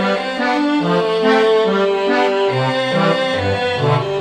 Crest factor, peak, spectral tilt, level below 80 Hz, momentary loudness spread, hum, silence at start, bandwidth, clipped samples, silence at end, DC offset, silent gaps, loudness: 14 dB; -2 dBFS; -6 dB/octave; -56 dBFS; 4 LU; none; 0 s; 9.8 kHz; under 0.1%; 0 s; under 0.1%; none; -16 LUFS